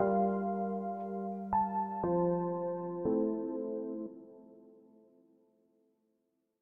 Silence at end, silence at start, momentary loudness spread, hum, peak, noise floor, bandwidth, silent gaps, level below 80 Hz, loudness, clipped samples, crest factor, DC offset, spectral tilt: 1.9 s; 0 s; 10 LU; none; -18 dBFS; -80 dBFS; 2.8 kHz; none; -66 dBFS; -35 LUFS; under 0.1%; 18 dB; under 0.1%; -12.5 dB/octave